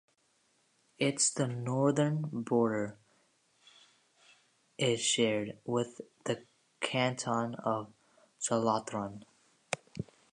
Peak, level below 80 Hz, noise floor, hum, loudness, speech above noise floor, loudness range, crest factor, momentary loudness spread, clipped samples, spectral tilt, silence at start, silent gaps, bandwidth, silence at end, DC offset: -12 dBFS; -72 dBFS; -73 dBFS; none; -33 LUFS; 41 dB; 3 LU; 22 dB; 13 LU; under 0.1%; -4 dB/octave; 1 s; none; 11 kHz; 0.3 s; under 0.1%